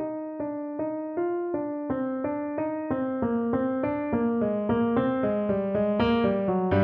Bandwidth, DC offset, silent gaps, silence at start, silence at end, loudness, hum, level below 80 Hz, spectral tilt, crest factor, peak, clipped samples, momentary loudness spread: 5.2 kHz; under 0.1%; none; 0 s; 0 s; -27 LUFS; none; -52 dBFS; -10 dB/octave; 16 dB; -10 dBFS; under 0.1%; 7 LU